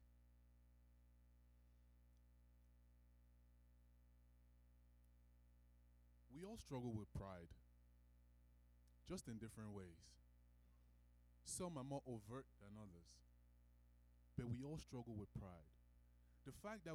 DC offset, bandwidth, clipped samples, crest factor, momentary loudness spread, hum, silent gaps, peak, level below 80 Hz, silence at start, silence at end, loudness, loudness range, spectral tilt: under 0.1%; 15 kHz; under 0.1%; 22 dB; 13 LU; 60 Hz at -70 dBFS; none; -36 dBFS; -70 dBFS; 0 s; 0 s; -55 LUFS; 5 LU; -5.5 dB/octave